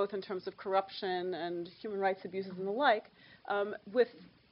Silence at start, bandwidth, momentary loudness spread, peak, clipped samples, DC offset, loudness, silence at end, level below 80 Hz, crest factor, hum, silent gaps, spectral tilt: 0 s; 5.6 kHz; 11 LU; -14 dBFS; under 0.1%; under 0.1%; -35 LUFS; 0.25 s; -80 dBFS; 20 dB; none; none; -7.5 dB/octave